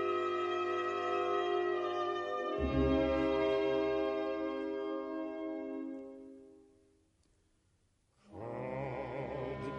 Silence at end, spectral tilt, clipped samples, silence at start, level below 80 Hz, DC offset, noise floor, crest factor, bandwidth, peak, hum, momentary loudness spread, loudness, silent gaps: 0 s; -7 dB/octave; under 0.1%; 0 s; -52 dBFS; under 0.1%; -74 dBFS; 16 dB; 8.2 kHz; -20 dBFS; none; 12 LU; -35 LUFS; none